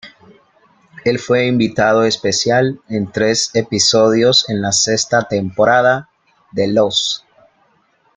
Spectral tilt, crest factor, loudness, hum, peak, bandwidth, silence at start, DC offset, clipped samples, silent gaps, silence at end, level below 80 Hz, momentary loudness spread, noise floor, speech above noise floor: -3.5 dB/octave; 16 dB; -14 LUFS; none; 0 dBFS; 9.6 kHz; 0.05 s; under 0.1%; under 0.1%; none; 1 s; -54 dBFS; 9 LU; -58 dBFS; 43 dB